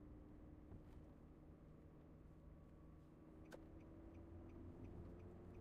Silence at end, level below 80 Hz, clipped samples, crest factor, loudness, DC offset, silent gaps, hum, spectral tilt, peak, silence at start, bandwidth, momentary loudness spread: 0 s; -66 dBFS; under 0.1%; 14 dB; -62 LUFS; under 0.1%; none; none; -8.5 dB/octave; -46 dBFS; 0 s; 6.2 kHz; 6 LU